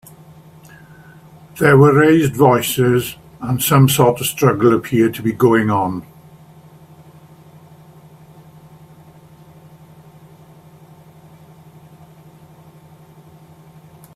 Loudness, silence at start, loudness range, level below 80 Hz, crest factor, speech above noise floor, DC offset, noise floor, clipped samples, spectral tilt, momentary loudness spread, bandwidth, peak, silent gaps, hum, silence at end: -14 LUFS; 1.55 s; 8 LU; -52 dBFS; 18 dB; 30 dB; under 0.1%; -44 dBFS; under 0.1%; -6 dB/octave; 13 LU; 16 kHz; 0 dBFS; none; none; 8.15 s